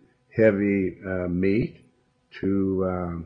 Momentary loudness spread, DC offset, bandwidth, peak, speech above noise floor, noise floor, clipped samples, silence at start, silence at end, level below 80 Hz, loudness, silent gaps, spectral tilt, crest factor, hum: 10 LU; under 0.1%; 5.6 kHz; -6 dBFS; 39 dB; -62 dBFS; under 0.1%; 0.35 s; 0 s; -52 dBFS; -25 LUFS; none; -10.5 dB/octave; 20 dB; none